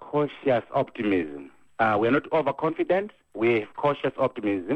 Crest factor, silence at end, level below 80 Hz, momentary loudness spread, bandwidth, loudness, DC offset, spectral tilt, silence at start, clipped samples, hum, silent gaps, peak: 16 dB; 0 s; -64 dBFS; 6 LU; 8.4 kHz; -25 LUFS; under 0.1%; -8 dB/octave; 0 s; under 0.1%; none; none; -8 dBFS